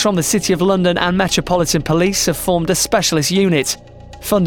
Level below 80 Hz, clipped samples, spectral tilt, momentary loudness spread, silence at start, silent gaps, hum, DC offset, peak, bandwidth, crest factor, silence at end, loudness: -38 dBFS; under 0.1%; -4 dB/octave; 3 LU; 0 s; none; none; under 0.1%; -2 dBFS; 19.5 kHz; 14 dB; 0 s; -15 LUFS